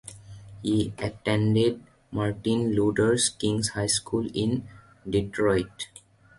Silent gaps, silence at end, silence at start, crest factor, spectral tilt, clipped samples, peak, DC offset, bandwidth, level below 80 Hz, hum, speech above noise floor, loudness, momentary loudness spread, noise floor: none; 0.55 s; 0.05 s; 16 dB; -5 dB/octave; under 0.1%; -10 dBFS; under 0.1%; 11.5 kHz; -50 dBFS; none; 20 dB; -26 LUFS; 16 LU; -45 dBFS